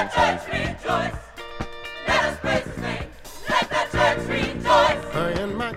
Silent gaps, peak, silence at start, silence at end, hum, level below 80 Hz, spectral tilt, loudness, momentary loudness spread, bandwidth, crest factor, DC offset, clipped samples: none; -6 dBFS; 0 s; 0 s; none; -40 dBFS; -4.5 dB/octave; -23 LUFS; 15 LU; 16 kHz; 18 dB; under 0.1%; under 0.1%